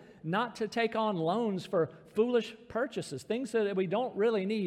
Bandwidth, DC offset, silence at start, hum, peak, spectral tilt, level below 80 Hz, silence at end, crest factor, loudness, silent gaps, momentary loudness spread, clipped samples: 13 kHz; under 0.1%; 0 s; none; -18 dBFS; -6 dB/octave; -74 dBFS; 0 s; 14 dB; -32 LUFS; none; 6 LU; under 0.1%